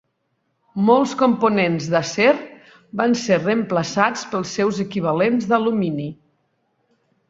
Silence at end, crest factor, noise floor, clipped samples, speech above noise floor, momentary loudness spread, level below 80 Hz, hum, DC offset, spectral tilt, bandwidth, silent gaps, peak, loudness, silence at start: 1.15 s; 18 dB; -71 dBFS; under 0.1%; 52 dB; 9 LU; -62 dBFS; none; under 0.1%; -5.5 dB/octave; 7.8 kHz; none; -2 dBFS; -19 LUFS; 0.75 s